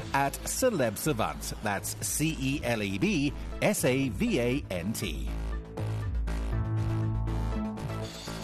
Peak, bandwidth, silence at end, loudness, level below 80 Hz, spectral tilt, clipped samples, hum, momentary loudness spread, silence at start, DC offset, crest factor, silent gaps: -10 dBFS; 13 kHz; 0 s; -30 LUFS; -38 dBFS; -5 dB/octave; under 0.1%; none; 9 LU; 0 s; under 0.1%; 20 dB; none